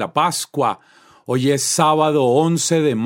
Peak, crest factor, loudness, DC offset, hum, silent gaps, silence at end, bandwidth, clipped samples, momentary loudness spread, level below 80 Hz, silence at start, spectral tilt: 0 dBFS; 16 dB; -17 LUFS; under 0.1%; none; none; 0 s; 16.5 kHz; under 0.1%; 7 LU; -64 dBFS; 0 s; -4.5 dB/octave